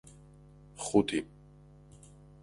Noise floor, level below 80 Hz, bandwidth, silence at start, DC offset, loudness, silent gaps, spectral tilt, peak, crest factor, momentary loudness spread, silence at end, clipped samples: -56 dBFS; -60 dBFS; 11.5 kHz; 0.75 s; under 0.1%; -31 LUFS; none; -5 dB/octave; -12 dBFS; 24 dB; 27 LU; 1.2 s; under 0.1%